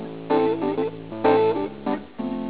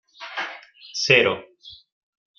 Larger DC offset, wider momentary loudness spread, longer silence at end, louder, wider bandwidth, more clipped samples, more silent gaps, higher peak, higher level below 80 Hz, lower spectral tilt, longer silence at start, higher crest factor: first, 0.4% vs under 0.1%; second, 10 LU vs 17 LU; second, 0 s vs 0.65 s; second, -23 LUFS vs -20 LUFS; second, 4 kHz vs 7.4 kHz; neither; neither; second, -8 dBFS vs -2 dBFS; first, -56 dBFS vs -66 dBFS; first, -10.5 dB/octave vs -3 dB/octave; second, 0 s vs 0.2 s; second, 16 dB vs 24 dB